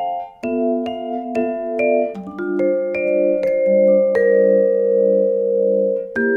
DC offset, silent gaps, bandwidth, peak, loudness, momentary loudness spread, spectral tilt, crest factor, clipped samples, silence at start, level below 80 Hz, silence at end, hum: under 0.1%; none; 4.8 kHz; -4 dBFS; -18 LUFS; 10 LU; -8.5 dB/octave; 12 dB; under 0.1%; 0 s; -60 dBFS; 0 s; none